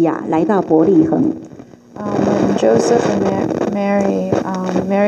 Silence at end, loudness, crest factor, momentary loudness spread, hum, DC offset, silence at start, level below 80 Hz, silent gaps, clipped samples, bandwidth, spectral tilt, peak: 0 s; -15 LUFS; 14 dB; 7 LU; none; under 0.1%; 0 s; -50 dBFS; none; under 0.1%; 8.8 kHz; -7 dB/octave; 0 dBFS